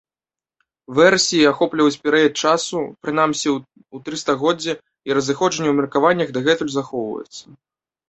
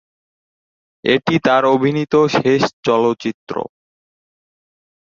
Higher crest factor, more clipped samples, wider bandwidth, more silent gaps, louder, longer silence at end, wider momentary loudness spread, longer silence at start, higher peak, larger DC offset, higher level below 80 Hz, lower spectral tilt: about the same, 18 dB vs 18 dB; neither; first, 8.4 kHz vs 7.6 kHz; second, none vs 2.73-2.83 s, 3.34-3.47 s; about the same, -18 LUFS vs -16 LUFS; second, 0.7 s vs 1.45 s; about the same, 13 LU vs 12 LU; second, 0.9 s vs 1.05 s; about the same, -2 dBFS vs 0 dBFS; neither; about the same, -60 dBFS vs -58 dBFS; second, -3.5 dB/octave vs -6 dB/octave